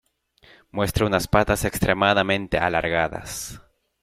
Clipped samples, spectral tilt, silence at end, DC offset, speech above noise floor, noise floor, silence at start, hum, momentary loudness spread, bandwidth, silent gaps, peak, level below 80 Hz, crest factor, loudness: under 0.1%; -4.5 dB/octave; 0.45 s; under 0.1%; 34 dB; -56 dBFS; 0.75 s; none; 13 LU; 16 kHz; none; -4 dBFS; -40 dBFS; 20 dB; -22 LUFS